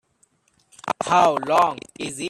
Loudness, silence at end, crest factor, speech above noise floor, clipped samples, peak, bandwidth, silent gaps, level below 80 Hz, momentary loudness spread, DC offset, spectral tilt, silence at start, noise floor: -20 LUFS; 0 s; 18 dB; 44 dB; under 0.1%; -4 dBFS; 13.5 kHz; none; -64 dBFS; 14 LU; under 0.1%; -4 dB/octave; 0.85 s; -64 dBFS